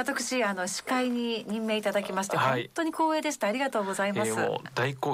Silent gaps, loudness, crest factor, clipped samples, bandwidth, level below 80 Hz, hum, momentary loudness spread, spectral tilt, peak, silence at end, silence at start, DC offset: none; -29 LUFS; 16 dB; under 0.1%; 16 kHz; -72 dBFS; none; 4 LU; -4 dB/octave; -14 dBFS; 0 s; 0 s; under 0.1%